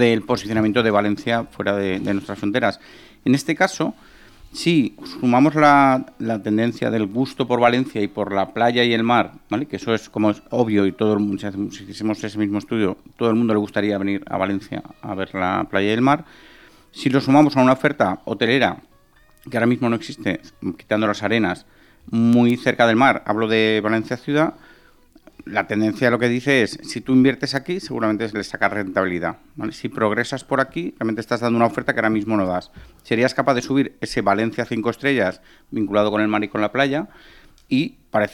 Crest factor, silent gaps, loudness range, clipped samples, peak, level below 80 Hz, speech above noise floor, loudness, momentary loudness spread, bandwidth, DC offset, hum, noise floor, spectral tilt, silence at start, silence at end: 18 dB; none; 4 LU; under 0.1%; -2 dBFS; -54 dBFS; 34 dB; -20 LUFS; 10 LU; 13.5 kHz; under 0.1%; none; -53 dBFS; -6 dB/octave; 0 s; 0 s